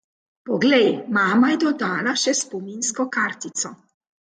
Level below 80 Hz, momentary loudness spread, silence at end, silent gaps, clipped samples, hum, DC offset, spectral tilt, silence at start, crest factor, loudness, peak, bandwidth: -70 dBFS; 11 LU; 0.55 s; none; under 0.1%; none; under 0.1%; -3 dB/octave; 0.45 s; 16 dB; -21 LUFS; -6 dBFS; 9.6 kHz